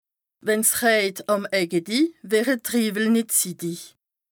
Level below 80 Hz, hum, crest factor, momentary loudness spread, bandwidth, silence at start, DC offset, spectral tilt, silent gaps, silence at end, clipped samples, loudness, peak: -70 dBFS; none; 18 dB; 10 LU; over 20 kHz; 0.45 s; under 0.1%; -3 dB/octave; none; 0.45 s; under 0.1%; -22 LUFS; -6 dBFS